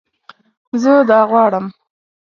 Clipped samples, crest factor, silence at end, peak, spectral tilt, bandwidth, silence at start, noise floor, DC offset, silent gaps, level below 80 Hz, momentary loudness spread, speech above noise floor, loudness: under 0.1%; 14 dB; 0.55 s; 0 dBFS; -6.5 dB/octave; 7.2 kHz; 0.75 s; -46 dBFS; under 0.1%; none; -66 dBFS; 13 LU; 34 dB; -13 LUFS